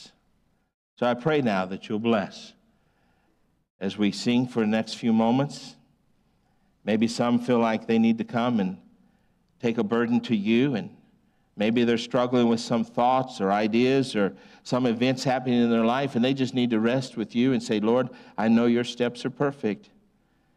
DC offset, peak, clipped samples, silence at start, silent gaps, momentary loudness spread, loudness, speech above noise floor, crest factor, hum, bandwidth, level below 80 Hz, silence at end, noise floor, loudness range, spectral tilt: under 0.1%; -12 dBFS; under 0.1%; 0 s; 0.74-0.97 s, 3.70-3.79 s; 9 LU; -25 LUFS; 44 dB; 14 dB; none; 10.5 kHz; -66 dBFS; 0.8 s; -68 dBFS; 4 LU; -6 dB/octave